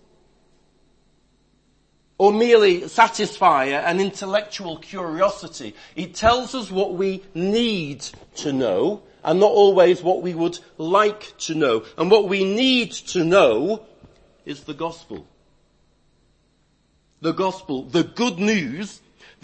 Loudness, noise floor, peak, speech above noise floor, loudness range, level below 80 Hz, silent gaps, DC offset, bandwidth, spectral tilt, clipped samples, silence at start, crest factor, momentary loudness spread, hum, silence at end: -20 LUFS; -63 dBFS; 0 dBFS; 43 dB; 10 LU; -52 dBFS; none; under 0.1%; 8.8 kHz; -4.5 dB/octave; under 0.1%; 2.2 s; 20 dB; 17 LU; none; 0.5 s